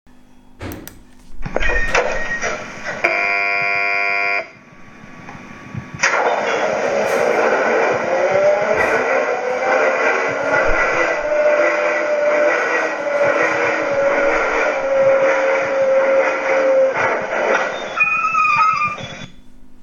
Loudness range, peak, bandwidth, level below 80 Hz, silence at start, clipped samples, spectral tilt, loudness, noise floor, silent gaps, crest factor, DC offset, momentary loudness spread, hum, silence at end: 4 LU; 0 dBFS; 17 kHz; -36 dBFS; 0.35 s; under 0.1%; -3.5 dB/octave; -16 LUFS; -43 dBFS; none; 18 dB; under 0.1%; 12 LU; none; 0 s